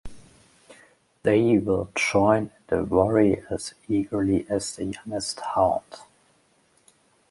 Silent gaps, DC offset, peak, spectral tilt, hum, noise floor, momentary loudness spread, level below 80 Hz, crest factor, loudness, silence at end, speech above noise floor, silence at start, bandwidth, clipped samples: none; under 0.1%; -4 dBFS; -5.5 dB/octave; none; -63 dBFS; 11 LU; -50 dBFS; 20 dB; -24 LUFS; 1.3 s; 40 dB; 0.05 s; 11.5 kHz; under 0.1%